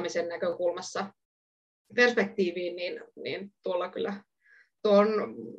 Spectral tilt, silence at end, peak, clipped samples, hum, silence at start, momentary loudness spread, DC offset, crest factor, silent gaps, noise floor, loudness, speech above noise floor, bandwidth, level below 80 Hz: -4.5 dB/octave; 0 s; -8 dBFS; under 0.1%; none; 0 s; 14 LU; under 0.1%; 22 dB; 1.25-1.85 s; -62 dBFS; -29 LUFS; 34 dB; 9.2 kHz; -82 dBFS